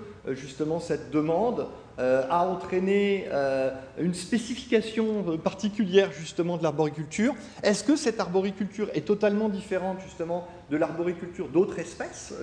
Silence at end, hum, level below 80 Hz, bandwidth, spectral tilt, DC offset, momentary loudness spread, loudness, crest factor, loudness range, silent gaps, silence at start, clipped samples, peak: 0 s; none; -58 dBFS; 10.5 kHz; -5.5 dB/octave; under 0.1%; 10 LU; -28 LUFS; 20 dB; 2 LU; none; 0 s; under 0.1%; -8 dBFS